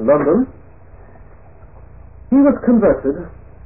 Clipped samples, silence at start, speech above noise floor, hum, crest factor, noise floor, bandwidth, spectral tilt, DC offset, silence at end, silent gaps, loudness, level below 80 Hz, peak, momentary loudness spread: under 0.1%; 0 s; 28 dB; none; 14 dB; -42 dBFS; 2.7 kHz; -15 dB/octave; 0.7%; 0.35 s; none; -15 LUFS; -40 dBFS; -2 dBFS; 13 LU